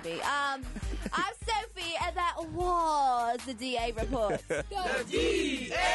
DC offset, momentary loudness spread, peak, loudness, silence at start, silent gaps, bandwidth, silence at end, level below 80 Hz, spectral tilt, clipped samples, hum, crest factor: under 0.1%; 6 LU; -18 dBFS; -31 LUFS; 0 s; none; 11.5 kHz; 0 s; -44 dBFS; -3.5 dB/octave; under 0.1%; none; 12 dB